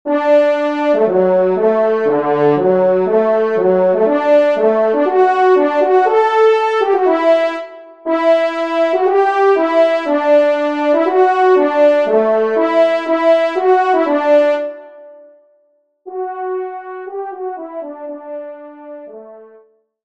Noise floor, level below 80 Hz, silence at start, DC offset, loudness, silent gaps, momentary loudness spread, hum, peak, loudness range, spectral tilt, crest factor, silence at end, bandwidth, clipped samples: -59 dBFS; -68 dBFS; 0.05 s; 0.3%; -13 LUFS; none; 16 LU; none; -2 dBFS; 14 LU; -6.5 dB/octave; 12 dB; 0.6 s; 8 kHz; under 0.1%